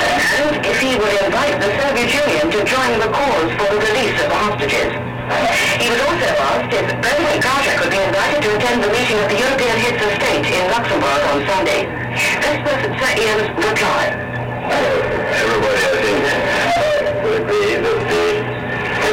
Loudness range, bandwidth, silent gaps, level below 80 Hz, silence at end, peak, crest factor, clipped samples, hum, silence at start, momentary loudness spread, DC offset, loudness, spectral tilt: 1 LU; 17.5 kHz; none; -40 dBFS; 0 s; -12 dBFS; 4 dB; under 0.1%; none; 0 s; 3 LU; 0.2%; -16 LUFS; -4 dB/octave